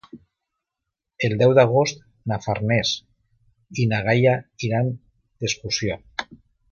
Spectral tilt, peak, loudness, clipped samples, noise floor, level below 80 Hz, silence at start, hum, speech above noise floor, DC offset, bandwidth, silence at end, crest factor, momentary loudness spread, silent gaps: -5 dB/octave; -2 dBFS; -22 LUFS; under 0.1%; -83 dBFS; -52 dBFS; 0.15 s; none; 63 dB; under 0.1%; 7.2 kHz; 0.35 s; 22 dB; 16 LU; none